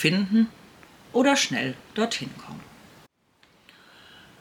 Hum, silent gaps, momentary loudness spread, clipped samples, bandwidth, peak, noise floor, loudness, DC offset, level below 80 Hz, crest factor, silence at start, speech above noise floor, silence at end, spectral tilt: none; none; 20 LU; under 0.1%; 16 kHz; -8 dBFS; -62 dBFS; -24 LUFS; under 0.1%; -66 dBFS; 20 dB; 0 s; 38 dB; 1.75 s; -4 dB/octave